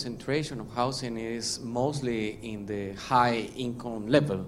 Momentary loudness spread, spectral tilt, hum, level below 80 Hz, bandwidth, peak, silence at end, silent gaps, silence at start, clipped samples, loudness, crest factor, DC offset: 10 LU; -5 dB/octave; none; -54 dBFS; 15 kHz; -8 dBFS; 0 s; none; 0 s; under 0.1%; -30 LUFS; 22 dB; under 0.1%